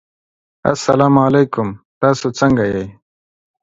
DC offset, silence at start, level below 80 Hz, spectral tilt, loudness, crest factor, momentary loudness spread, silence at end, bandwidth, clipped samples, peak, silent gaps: under 0.1%; 0.65 s; -46 dBFS; -6.5 dB/octave; -15 LUFS; 16 dB; 12 LU; 0.7 s; 8 kHz; under 0.1%; 0 dBFS; 1.85-2.01 s